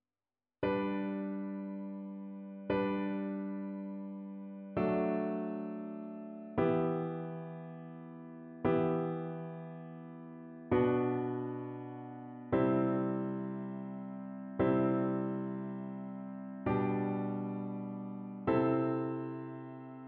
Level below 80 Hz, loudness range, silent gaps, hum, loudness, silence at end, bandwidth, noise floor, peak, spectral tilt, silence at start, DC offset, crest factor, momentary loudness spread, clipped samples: -66 dBFS; 4 LU; none; none; -36 LUFS; 0 s; 4.3 kHz; under -90 dBFS; -18 dBFS; -8 dB/octave; 0.6 s; under 0.1%; 18 dB; 15 LU; under 0.1%